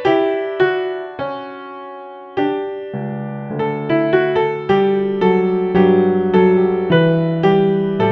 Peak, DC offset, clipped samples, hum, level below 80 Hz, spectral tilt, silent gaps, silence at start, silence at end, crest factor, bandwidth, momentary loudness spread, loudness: -2 dBFS; under 0.1%; under 0.1%; none; -54 dBFS; -9 dB/octave; none; 0 s; 0 s; 14 dB; 5.6 kHz; 13 LU; -17 LUFS